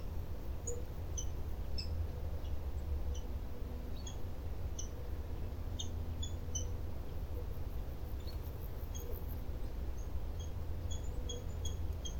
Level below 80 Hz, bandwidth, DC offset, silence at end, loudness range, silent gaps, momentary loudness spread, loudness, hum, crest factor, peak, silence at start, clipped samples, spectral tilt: -42 dBFS; 18 kHz; under 0.1%; 0 s; 2 LU; none; 4 LU; -44 LUFS; none; 12 dB; -26 dBFS; 0 s; under 0.1%; -5 dB/octave